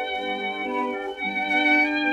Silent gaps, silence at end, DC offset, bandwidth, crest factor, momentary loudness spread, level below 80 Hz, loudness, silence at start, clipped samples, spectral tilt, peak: none; 0 s; under 0.1%; 10.5 kHz; 16 dB; 9 LU; -62 dBFS; -23 LUFS; 0 s; under 0.1%; -4 dB/octave; -8 dBFS